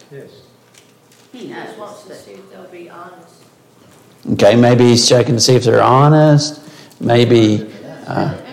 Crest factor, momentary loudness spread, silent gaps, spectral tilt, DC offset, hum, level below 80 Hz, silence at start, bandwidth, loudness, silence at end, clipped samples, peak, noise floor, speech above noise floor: 14 dB; 23 LU; none; -5.5 dB/octave; under 0.1%; none; -52 dBFS; 0.15 s; 15 kHz; -11 LUFS; 0 s; under 0.1%; 0 dBFS; -48 dBFS; 35 dB